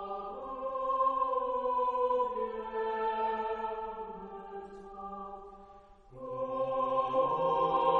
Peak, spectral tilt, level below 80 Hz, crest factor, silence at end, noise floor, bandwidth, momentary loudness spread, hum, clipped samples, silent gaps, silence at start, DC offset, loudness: -14 dBFS; -7 dB/octave; -62 dBFS; 18 dB; 0 s; -55 dBFS; 6 kHz; 16 LU; none; under 0.1%; none; 0 s; under 0.1%; -33 LUFS